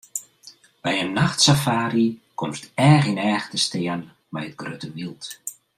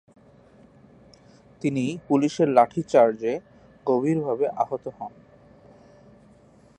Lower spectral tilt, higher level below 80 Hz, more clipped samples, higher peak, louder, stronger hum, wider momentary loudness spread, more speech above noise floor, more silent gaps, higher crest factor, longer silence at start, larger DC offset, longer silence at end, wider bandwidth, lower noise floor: second, -4.5 dB/octave vs -7 dB/octave; first, -58 dBFS vs -66 dBFS; neither; about the same, -4 dBFS vs -4 dBFS; about the same, -21 LUFS vs -23 LUFS; neither; first, 17 LU vs 14 LU; second, 28 dB vs 32 dB; neither; about the same, 20 dB vs 22 dB; second, 0.15 s vs 1.65 s; neither; second, 0.25 s vs 1.7 s; first, 15.5 kHz vs 10 kHz; second, -50 dBFS vs -54 dBFS